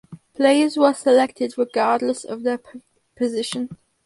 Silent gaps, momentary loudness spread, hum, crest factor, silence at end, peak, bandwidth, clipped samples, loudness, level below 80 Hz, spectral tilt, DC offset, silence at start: none; 12 LU; none; 18 dB; 0.3 s; -4 dBFS; 11.5 kHz; under 0.1%; -20 LUFS; -68 dBFS; -4 dB/octave; under 0.1%; 0.1 s